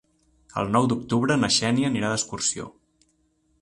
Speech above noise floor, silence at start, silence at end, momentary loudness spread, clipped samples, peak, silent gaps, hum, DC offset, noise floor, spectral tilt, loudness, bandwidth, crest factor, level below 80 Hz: 44 dB; 0.55 s; 0.9 s; 13 LU; under 0.1%; -8 dBFS; none; none; under 0.1%; -67 dBFS; -4 dB/octave; -23 LUFS; 11.5 kHz; 18 dB; -56 dBFS